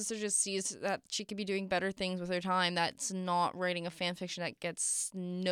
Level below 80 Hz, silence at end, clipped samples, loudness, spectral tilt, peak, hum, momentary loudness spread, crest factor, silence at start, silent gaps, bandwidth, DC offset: -72 dBFS; 0 s; under 0.1%; -34 LUFS; -3 dB/octave; -16 dBFS; none; 7 LU; 18 dB; 0 s; none; 16 kHz; under 0.1%